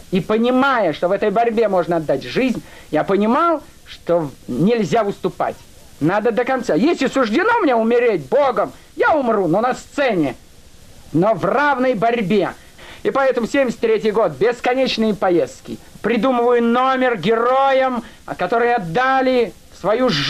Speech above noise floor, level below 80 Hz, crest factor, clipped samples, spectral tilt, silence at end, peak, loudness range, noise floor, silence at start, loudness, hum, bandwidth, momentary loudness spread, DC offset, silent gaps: 25 dB; -50 dBFS; 10 dB; under 0.1%; -6 dB/octave; 0 s; -8 dBFS; 2 LU; -42 dBFS; 0.1 s; -17 LUFS; none; 14.5 kHz; 9 LU; under 0.1%; none